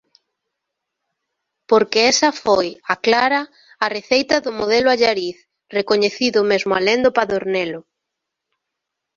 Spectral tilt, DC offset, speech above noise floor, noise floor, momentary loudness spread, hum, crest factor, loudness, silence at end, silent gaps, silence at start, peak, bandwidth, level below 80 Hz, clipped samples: -2.5 dB/octave; under 0.1%; 63 dB; -80 dBFS; 9 LU; none; 18 dB; -17 LUFS; 1.35 s; none; 1.7 s; 0 dBFS; 7.6 kHz; -58 dBFS; under 0.1%